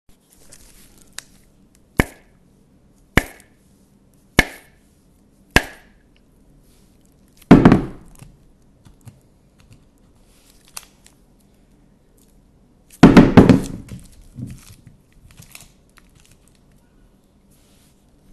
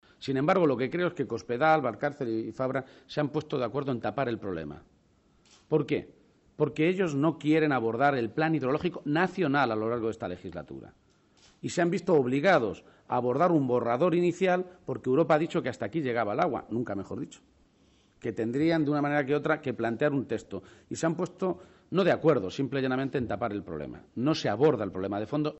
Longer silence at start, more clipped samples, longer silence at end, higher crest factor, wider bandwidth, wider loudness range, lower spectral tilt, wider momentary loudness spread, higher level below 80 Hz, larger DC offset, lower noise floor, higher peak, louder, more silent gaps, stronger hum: first, 2 s vs 0.2 s; neither; first, 3.85 s vs 0 s; about the same, 20 dB vs 18 dB; first, 13.5 kHz vs 8.2 kHz; first, 11 LU vs 6 LU; about the same, -6.5 dB/octave vs -7 dB/octave; first, 28 LU vs 12 LU; first, -36 dBFS vs -64 dBFS; neither; second, -54 dBFS vs -65 dBFS; first, 0 dBFS vs -10 dBFS; first, -14 LUFS vs -28 LUFS; neither; neither